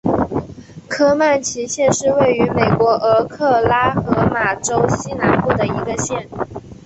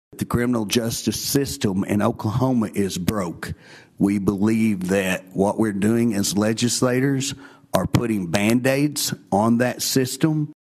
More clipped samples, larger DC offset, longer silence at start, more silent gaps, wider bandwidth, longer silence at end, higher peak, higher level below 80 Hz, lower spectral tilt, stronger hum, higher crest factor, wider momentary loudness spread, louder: neither; neither; about the same, 0.05 s vs 0.15 s; neither; second, 8.4 kHz vs 14.5 kHz; about the same, 0.1 s vs 0.1 s; about the same, -2 dBFS vs -4 dBFS; first, -40 dBFS vs -48 dBFS; about the same, -5 dB/octave vs -5 dB/octave; neither; about the same, 14 dB vs 18 dB; first, 10 LU vs 5 LU; first, -16 LUFS vs -21 LUFS